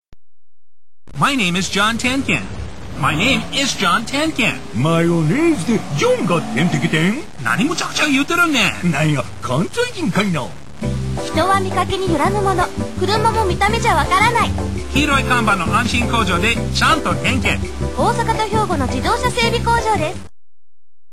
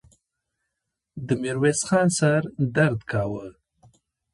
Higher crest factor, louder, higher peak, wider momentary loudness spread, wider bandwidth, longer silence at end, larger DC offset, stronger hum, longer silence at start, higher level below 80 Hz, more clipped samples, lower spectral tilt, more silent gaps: about the same, 16 dB vs 20 dB; first, -17 LUFS vs -23 LUFS; first, -2 dBFS vs -6 dBFS; second, 7 LU vs 17 LU; first, 16 kHz vs 11.5 kHz; about the same, 0.85 s vs 0.85 s; first, 3% vs under 0.1%; neither; second, 0 s vs 1.15 s; first, -32 dBFS vs -56 dBFS; neither; about the same, -4.5 dB/octave vs -5.5 dB/octave; neither